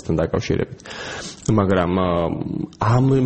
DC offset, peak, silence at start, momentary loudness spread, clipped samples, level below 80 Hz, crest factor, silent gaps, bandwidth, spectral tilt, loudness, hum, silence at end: under 0.1%; -4 dBFS; 0 s; 12 LU; under 0.1%; -40 dBFS; 16 dB; none; 8.6 kHz; -7 dB/octave; -21 LUFS; none; 0 s